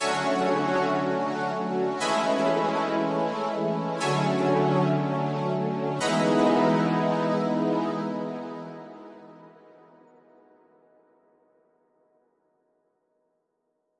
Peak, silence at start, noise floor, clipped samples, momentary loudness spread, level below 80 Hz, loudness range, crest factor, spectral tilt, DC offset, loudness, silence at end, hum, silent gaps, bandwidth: -12 dBFS; 0 s; -76 dBFS; under 0.1%; 10 LU; -74 dBFS; 10 LU; 16 dB; -6 dB/octave; under 0.1%; -25 LUFS; 4.5 s; none; none; 11.5 kHz